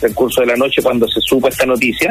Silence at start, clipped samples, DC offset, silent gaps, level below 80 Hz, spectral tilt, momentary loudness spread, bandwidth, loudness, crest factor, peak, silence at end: 0 s; under 0.1%; under 0.1%; none; -40 dBFS; -3.5 dB/octave; 1 LU; 15.5 kHz; -13 LUFS; 12 dB; -2 dBFS; 0 s